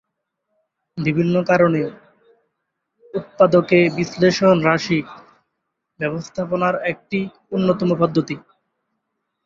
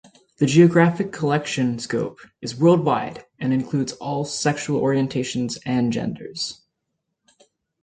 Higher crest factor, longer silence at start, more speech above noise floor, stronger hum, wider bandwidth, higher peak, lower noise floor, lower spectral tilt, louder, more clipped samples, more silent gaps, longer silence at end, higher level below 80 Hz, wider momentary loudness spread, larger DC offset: about the same, 18 dB vs 20 dB; first, 0.95 s vs 0.4 s; about the same, 59 dB vs 57 dB; neither; second, 7.6 kHz vs 9.4 kHz; about the same, -2 dBFS vs -2 dBFS; about the same, -77 dBFS vs -78 dBFS; about the same, -6.5 dB/octave vs -6 dB/octave; first, -18 LUFS vs -21 LUFS; neither; neither; second, 1.05 s vs 1.3 s; about the same, -58 dBFS vs -60 dBFS; about the same, 14 LU vs 13 LU; neither